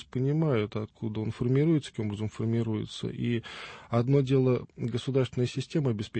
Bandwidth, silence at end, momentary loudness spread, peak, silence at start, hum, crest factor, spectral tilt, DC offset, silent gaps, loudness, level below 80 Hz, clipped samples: 8.8 kHz; 0 s; 9 LU; -12 dBFS; 0 s; none; 16 dB; -7.5 dB/octave; under 0.1%; none; -29 LUFS; -60 dBFS; under 0.1%